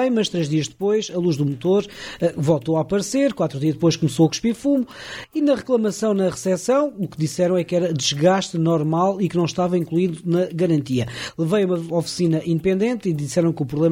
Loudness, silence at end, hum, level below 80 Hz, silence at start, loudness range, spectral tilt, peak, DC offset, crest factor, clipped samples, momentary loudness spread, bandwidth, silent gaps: -21 LUFS; 0 s; none; -56 dBFS; 0 s; 1 LU; -6 dB/octave; -4 dBFS; under 0.1%; 16 dB; under 0.1%; 5 LU; 15.5 kHz; none